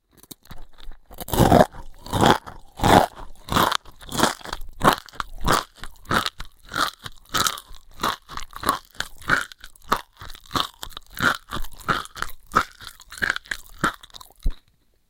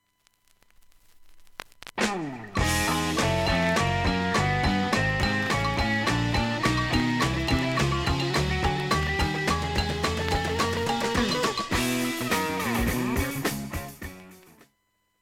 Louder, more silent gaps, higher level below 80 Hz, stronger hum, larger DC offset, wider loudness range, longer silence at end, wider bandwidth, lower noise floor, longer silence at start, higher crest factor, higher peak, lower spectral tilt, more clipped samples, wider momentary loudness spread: first, -23 LUFS vs -26 LUFS; neither; about the same, -36 dBFS vs -38 dBFS; neither; neither; first, 7 LU vs 4 LU; second, 0.5 s vs 0.85 s; about the same, 17 kHz vs 17 kHz; second, -61 dBFS vs -73 dBFS; second, 0.5 s vs 1.2 s; about the same, 24 dB vs 20 dB; first, 0 dBFS vs -8 dBFS; about the same, -4 dB/octave vs -4.5 dB/octave; neither; first, 23 LU vs 6 LU